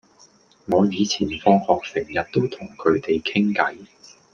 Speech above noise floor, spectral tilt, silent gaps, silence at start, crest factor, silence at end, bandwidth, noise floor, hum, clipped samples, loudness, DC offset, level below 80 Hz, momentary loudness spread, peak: 33 dB; -5.5 dB/octave; none; 0.7 s; 20 dB; 0.5 s; 7.2 kHz; -54 dBFS; none; under 0.1%; -21 LUFS; under 0.1%; -56 dBFS; 7 LU; -2 dBFS